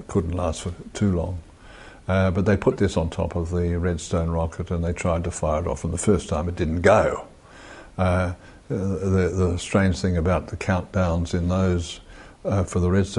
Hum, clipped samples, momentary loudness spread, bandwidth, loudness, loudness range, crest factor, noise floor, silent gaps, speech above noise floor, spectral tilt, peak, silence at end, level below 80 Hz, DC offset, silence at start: none; under 0.1%; 11 LU; 11 kHz; -24 LUFS; 2 LU; 20 dB; -44 dBFS; none; 22 dB; -6.5 dB/octave; -4 dBFS; 0 s; -32 dBFS; under 0.1%; 0 s